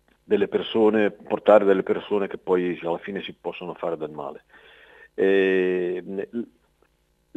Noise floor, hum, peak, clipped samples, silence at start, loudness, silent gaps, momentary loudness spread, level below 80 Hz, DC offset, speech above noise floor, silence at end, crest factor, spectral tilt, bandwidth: -66 dBFS; none; -2 dBFS; under 0.1%; 0.3 s; -23 LUFS; none; 16 LU; -66 dBFS; under 0.1%; 43 dB; 0.9 s; 22 dB; -7.5 dB/octave; 7.8 kHz